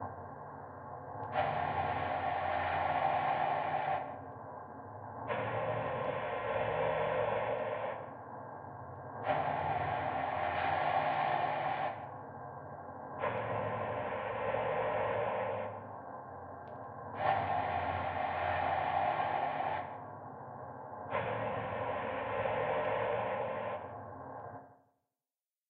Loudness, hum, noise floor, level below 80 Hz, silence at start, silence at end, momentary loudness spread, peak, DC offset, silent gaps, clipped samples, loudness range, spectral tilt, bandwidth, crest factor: -36 LUFS; none; under -90 dBFS; -66 dBFS; 0 s; 0.95 s; 14 LU; -16 dBFS; under 0.1%; none; under 0.1%; 3 LU; -3.5 dB/octave; 5 kHz; 20 dB